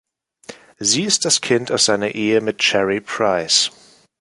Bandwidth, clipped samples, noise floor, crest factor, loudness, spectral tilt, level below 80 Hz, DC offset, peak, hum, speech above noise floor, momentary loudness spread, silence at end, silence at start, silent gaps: 11.5 kHz; under 0.1%; -41 dBFS; 18 dB; -17 LUFS; -2 dB/octave; -58 dBFS; under 0.1%; -2 dBFS; none; 23 dB; 5 LU; 0.5 s; 0.5 s; none